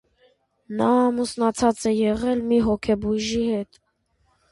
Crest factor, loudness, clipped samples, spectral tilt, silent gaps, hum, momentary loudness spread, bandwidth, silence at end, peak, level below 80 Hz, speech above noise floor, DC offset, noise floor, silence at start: 16 dB; -22 LUFS; under 0.1%; -5.5 dB/octave; none; none; 6 LU; 11.5 kHz; 0.9 s; -6 dBFS; -48 dBFS; 46 dB; under 0.1%; -68 dBFS; 0.7 s